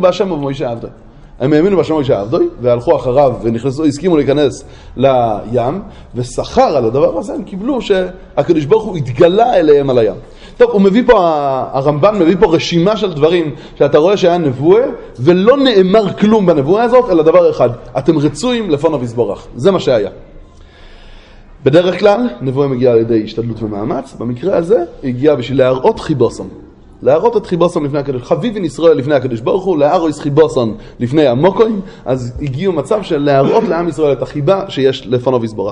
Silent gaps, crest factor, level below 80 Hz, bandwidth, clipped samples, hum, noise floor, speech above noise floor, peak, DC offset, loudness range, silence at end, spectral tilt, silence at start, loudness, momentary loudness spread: none; 12 dB; -38 dBFS; 10.5 kHz; under 0.1%; none; -37 dBFS; 25 dB; 0 dBFS; under 0.1%; 4 LU; 0 s; -7 dB/octave; 0 s; -12 LUFS; 10 LU